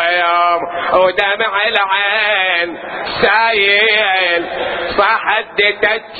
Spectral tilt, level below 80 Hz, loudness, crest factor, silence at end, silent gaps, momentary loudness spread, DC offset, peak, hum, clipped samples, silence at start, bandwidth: -5 dB/octave; -48 dBFS; -13 LUFS; 14 dB; 0 s; none; 7 LU; under 0.1%; 0 dBFS; none; under 0.1%; 0 s; 5.6 kHz